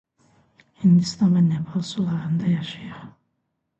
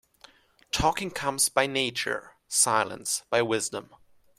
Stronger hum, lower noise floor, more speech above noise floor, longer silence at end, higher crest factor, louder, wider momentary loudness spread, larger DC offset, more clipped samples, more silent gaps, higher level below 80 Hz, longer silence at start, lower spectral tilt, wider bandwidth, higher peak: neither; first, -76 dBFS vs -57 dBFS; first, 55 dB vs 30 dB; first, 0.7 s vs 0.55 s; second, 16 dB vs 22 dB; first, -21 LUFS vs -26 LUFS; first, 17 LU vs 9 LU; neither; neither; neither; second, -60 dBFS vs -50 dBFS; about the same, 0.8 s vs 0.75 s; first, -7 dB/octave vs -2 dB/octave; second, 8.2 kHz vs 16 kHz; about the same, -8 dBFS vs -6 dBFS